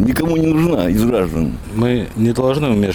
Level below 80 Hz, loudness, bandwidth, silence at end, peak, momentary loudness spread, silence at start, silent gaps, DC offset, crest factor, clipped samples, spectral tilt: -32 dBFS; -16 LUFS; 19.5 kHz; 0 s; -4 dBFS; 5 LU; 0 s; none; under 0.1%; 10 dB; under 0.1%; -7 dB/octave